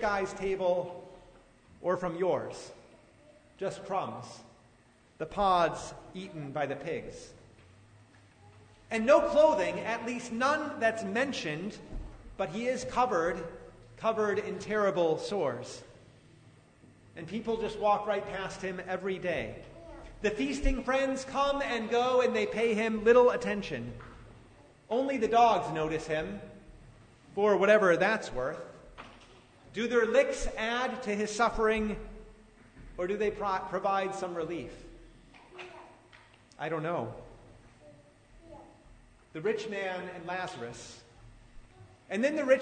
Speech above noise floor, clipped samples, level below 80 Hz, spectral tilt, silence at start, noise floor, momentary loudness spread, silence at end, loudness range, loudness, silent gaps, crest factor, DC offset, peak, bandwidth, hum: 32 dB; under 0.1%; -50 dBFS; -5 dB/octave; 0 s; -62 dBFS; 22 LU; 0 s; 11 LU; -30 LUFS; none; 20 dB; under 0.1%; -12 dBFS; 9.6 kHz; none